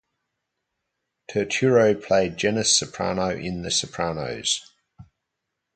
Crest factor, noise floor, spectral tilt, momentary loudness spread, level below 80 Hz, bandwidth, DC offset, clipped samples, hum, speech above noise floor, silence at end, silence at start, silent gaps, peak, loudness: 18 dB; -81 dBFS; -3 dB/octave; 9 LU; -54 dBFS; 9.4 kHz; under 0.1%; under 0.1%; none; 59 dB; 0.75 s; 1.3 s; none; -6 dBFS; -22 LUFS